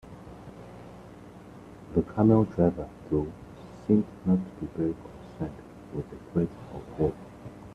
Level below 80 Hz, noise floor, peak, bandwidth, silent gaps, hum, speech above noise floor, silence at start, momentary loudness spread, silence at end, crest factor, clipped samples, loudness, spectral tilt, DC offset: -52 dBFS; -47 dBFS; -8 dBFS; 9.6 kHz; none; none; 20 dB; 0.05 s; 23 LU; 0 s; 22 dB; under 0.1%; -29 LUFS; -10.5 dB/octave; under 0.1%